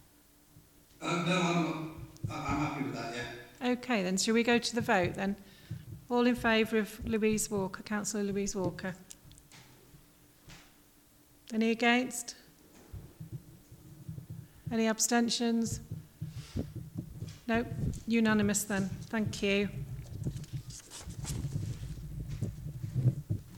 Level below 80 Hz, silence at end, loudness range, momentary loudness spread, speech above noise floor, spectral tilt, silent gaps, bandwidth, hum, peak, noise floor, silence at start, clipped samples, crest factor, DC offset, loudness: -52 dBFS; 0 s; 7 LU; 18 LU; 32 dB; -4.5 dB/octave; none; 19 kHz; none; -14 dBFS; -62 dBFS; 0.55 s; under 0.1%; 20 dB; under 0.1%; -32 LUFS